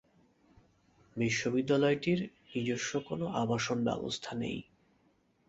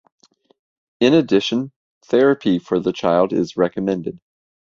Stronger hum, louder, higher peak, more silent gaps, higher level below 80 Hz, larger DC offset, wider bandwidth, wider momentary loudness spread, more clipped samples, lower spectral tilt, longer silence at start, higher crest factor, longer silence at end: neither; second, -33 LUFS vs -18 LUFS; second, -16 dBFS vs -2 dBFS; second, none vs 1.76-2.01 s; second, -66 dBFS vs -58 dBFS; neither; about the same, 8 kHz vs 7.6 kHz; about the same, 10 LU vs 9 LU; neither; second, -5 dB/octave vs -6.5 dB/octave; first, 1.15 s vs 1 s; about the same, 18 dB vs 16 dB; first, 0.85 s vs 0.5 s